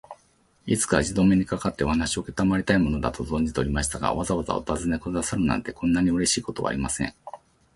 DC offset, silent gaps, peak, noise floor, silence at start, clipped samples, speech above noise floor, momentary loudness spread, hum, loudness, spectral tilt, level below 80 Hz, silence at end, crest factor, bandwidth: under 0.1%; none; -4 dBFS; -62 dBFS; 0.1 s; under 0.1%; 38 dB; 7 LU; none; -25 LUFS; -5 dB/octave; -40 dBFS; 0.4 s; 20 dB; 11.5 kHz